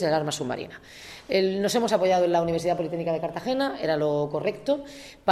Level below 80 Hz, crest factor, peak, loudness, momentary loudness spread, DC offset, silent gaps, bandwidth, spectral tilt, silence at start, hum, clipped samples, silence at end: -58 dBFS; 18 dB; -8 dBFS; -26 LUFS; 13 LU; under 0.1%; none; 14.5 kHz; -5 dB/octave; 0 s; none; under 0.1%; 0 s